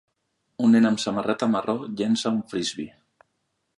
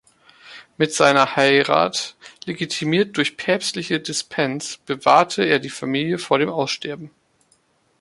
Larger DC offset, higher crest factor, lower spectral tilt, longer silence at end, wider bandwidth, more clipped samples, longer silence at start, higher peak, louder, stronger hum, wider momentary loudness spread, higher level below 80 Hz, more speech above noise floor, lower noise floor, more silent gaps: neither; about the same, 16 dB vs 20 dB; about the same, -5 dB/octave vs -4 dB/octave; about the same, 0.9 s vs 0.9 s; about the same, 11 kHz vs 11.5 kHz; neither; first, 0.6 s vs 0.45 s; second, -8 dBFS vs -2 dBFS; second, -23 LUFS vs -19 LUFS; neither; about the same, 11 LU vs 12 LU; about the same, -66 dBFS vs -64 dBFS; first, 53 dB vs 42 dB; first, -75 dBFS vs -62 dBFS; neither